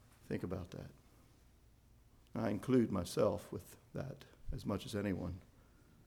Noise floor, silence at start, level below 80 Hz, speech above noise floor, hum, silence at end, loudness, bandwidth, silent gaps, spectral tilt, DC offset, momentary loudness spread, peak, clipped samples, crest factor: -66 dBFS; 0.25 s; -58 dBFS; 27 dB; none; 0.65 s; -40 LUFS; 19.5 kHz; none; -6.5 dB/octave; under 0.1%; 17 LU; -22 dBFS; under 0.1%; 20 dB